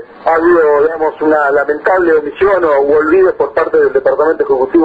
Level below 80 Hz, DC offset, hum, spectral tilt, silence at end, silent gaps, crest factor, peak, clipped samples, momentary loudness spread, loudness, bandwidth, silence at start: -46 dBFS; under 0.1%; none; -7.5 dB/octave; 0 s; none; 10 dB; 0 dBFS; under 0.1%; 4 LU; -11 LUFS; 4.9 kHz; 0 s